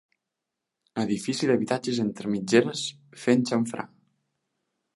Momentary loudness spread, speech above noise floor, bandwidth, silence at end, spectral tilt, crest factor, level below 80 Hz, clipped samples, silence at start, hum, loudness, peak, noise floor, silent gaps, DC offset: 11 LU; 60 dB; 11.5 kHz; 1.1 s; -5 dB/octave; 22 dB; -70 dBFS; under 0.1%; 0.95 s; none; -26 LUFS; -6 dBFS; -85 dBFS; none; under 0.1%